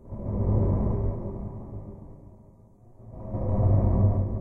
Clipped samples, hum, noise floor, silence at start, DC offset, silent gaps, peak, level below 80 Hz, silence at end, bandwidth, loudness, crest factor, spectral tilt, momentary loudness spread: under 0.1%; none; -53 dBFS; 0.05 s; under 0.1%; none; -12 dBFS; -34 dBFS; 0 s; 2.3 kHz; -27 LUFS; 16 dB; -13.5 dB/octave; 21 LU